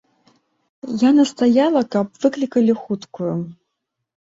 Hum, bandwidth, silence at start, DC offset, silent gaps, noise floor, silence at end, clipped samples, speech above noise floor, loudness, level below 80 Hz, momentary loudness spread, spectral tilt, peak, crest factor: none; 8 kHz; 0.85 s; under 0.1%; none; -78 dBFS; 0.8 s; under 0.1%; 60 dB; -18 LUFS; -64 dBFS; 13 LU; -6.5 dB/octave; -4 dBFS; 16 dB